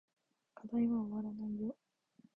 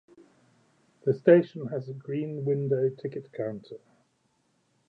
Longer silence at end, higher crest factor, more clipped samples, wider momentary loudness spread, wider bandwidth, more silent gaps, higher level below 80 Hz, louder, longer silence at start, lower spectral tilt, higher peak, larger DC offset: second, 0.65 s vs 1.1 s; second, 14 dB vs 22 dB; neither; about the same, 16 LU vs 17 LU; second, 3 kHz vs 5.8 kHz; neither; first, -72 dBFS vs -78 dBFS; second, -39 LUFS vs -27 LUFS; second, 0.55 s vs 1.05 s; about the same, -11 dB/octave vs -10 dB/octave; second, -26 dBFS vs -6 dBFS; neither